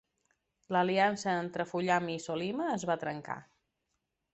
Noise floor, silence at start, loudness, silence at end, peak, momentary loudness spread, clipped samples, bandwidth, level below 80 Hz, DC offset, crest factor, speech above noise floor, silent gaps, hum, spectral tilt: -83 dBFS; 0.7 s; -32 LUFS; 0.9 s; -14 dBFS; 10 LU; under 0.1%; 8.4 kHz; -74 dBFS; under 0.1%; 20 dB; 51 dB; none; none; -5 dB/octave